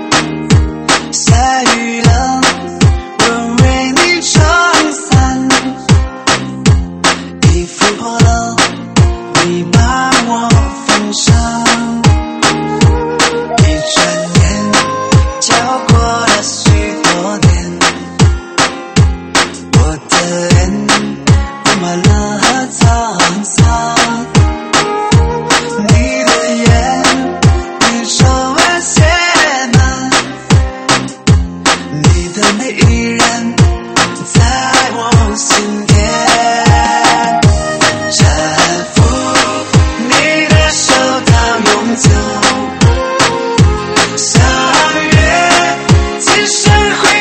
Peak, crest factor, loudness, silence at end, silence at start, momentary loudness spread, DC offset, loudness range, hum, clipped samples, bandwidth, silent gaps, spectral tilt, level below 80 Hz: 0 dBFS; 10 dB; -10 LUFS; 0 s; 0 s; 3 LU; under 0.1%; 2 LU; none; 0.3%; 11 kHz; none; -4 dB/octave; -20 dBFS